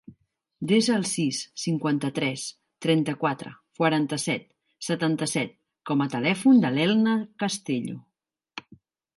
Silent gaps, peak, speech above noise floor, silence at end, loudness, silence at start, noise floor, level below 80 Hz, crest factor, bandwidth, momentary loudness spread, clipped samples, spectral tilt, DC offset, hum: none; -8 dBFS; 58 dB; 0.55 s; -25 LUFS; 0.1 s; -82 dBFS; -72 dBFS; 18 dB; 11.5 kHz; 15 LU; under 0.1%; -5 dB/octave; under 0.1%; none